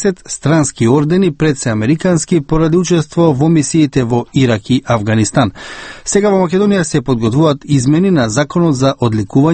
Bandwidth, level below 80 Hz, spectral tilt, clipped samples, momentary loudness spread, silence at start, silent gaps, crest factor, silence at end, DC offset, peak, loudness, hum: 8.8 kHz; -36 dBFS; -6 dB/octave; under 0.1%; 4 LU; 0 s; none; 12 dB; 0 s; under 0.1%; 0 dBFS; -13 LUFS; none